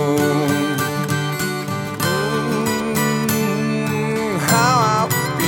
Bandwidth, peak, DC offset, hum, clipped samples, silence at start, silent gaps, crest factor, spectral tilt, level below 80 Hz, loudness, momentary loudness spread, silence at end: 19.5 kHz; -2 dBFS; under 0.1%; none; under 0.1%; 0 s; none; 18 dB; -4.5 dB/octave; -52 dBFS; -19 LUFS; 6 LU; 0 s